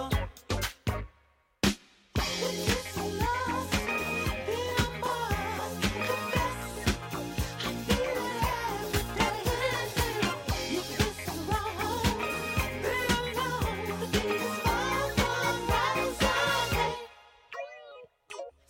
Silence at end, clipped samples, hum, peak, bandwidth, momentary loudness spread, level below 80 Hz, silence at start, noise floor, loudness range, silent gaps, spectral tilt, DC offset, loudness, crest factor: 0.2 s; under 0.1%; none; -12 dBFS; 17 kHz; 8 LU; -42 dBFS; 0 s; -66 dBFS; 3 LU; none; -4 dB/octave; under 0.1%; -30 LUFS; 20 dB